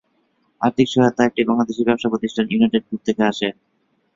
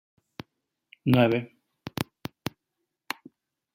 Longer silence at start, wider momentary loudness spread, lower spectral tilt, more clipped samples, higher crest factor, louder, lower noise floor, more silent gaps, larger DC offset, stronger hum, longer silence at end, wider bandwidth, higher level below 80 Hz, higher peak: second, 0.6 s vs 1.05 s; second, 6 LU vs 24 LU; about the same, -6 dB/octave vs -6.5 dB/octave; neither; second, 18 dB vs 26 dB; first, -19 LUFS vs -28 LUFS; second, -65 dBFS vs -83 dBFS; neither; neither; neither; second, 0.65 s vs 1.7 s; second, 7.6 kHz vs 16.5 kHz; first, -58 dBFS vs -64 dBFS; first, -2 dBFS vs -6 dBFS